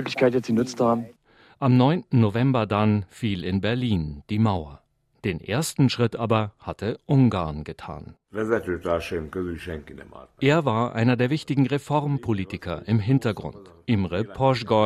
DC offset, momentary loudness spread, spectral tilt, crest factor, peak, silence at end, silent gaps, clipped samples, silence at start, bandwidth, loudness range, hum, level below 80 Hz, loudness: under 0.1%; 14 LU; -7 dB/octave; 18 dB; -6 dBFS; 0 s; none; under 0.1%; 0 s; 13.5 kHz; 4 LU; none; -52 dBFS; -24 LUFS